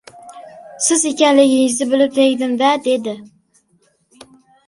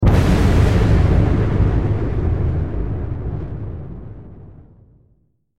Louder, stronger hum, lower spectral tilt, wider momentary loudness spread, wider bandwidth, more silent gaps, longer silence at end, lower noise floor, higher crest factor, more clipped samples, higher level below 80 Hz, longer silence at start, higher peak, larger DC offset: first, -15 LUFS vs -18 LUFS; neither; second, -2 dB/octave vs -8 dB/octave; second, 8 LU vs 17 LU; about the same, 11.5 kHz vs 11.5 kHz; neither; first, 1.4 s vs 0 s; about the same, -60 dBFS vs -60 dBFS; about the same, 16 dB vs 14 dB; neither; second, -66 dBFS vs -22 dBFS; first, 0.25 s vs 0 s; first, 0 dBFS vs -4 dBFS; second, under 0.1% vs 2%